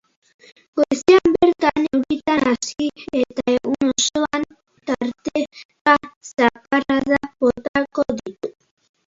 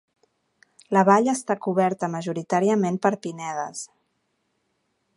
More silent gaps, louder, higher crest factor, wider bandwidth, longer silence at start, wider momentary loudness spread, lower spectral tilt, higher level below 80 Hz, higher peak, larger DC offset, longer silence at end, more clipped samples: first, 5.65-5.69 s, 5.81-5.85 s, 6.16-6.21 s, 7.68-7.74 s vs none; first, -19 LUFS vs -23 LUFS; about the same, 20 dB vs 22 dB; second, 7.8 kHz vs 11.5 kHz; second, 0.75 s vs 0.9 s; about the same, 12 LU vs 13 LU; second, -3.5 dB/octave vs -6 dB/octave; first, -52 dBFS vs -76 dBFS; about the same, 0 dBFS vs -2 dBFS; neither; second, 0.6 s vs 1.3 s; neither